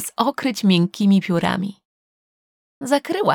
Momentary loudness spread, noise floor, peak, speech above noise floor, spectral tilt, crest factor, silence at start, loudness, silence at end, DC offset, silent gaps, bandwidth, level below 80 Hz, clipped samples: 8 LU; under -90 dBFS; -2 dBFS; over 71 dB; -5.5 dB/octave; 18 dB; 0 s; -19 LUFS; 0 s; under 0.1%; 1.85-2.81 s; 17 kHz; -62 dBFS; under 0.1%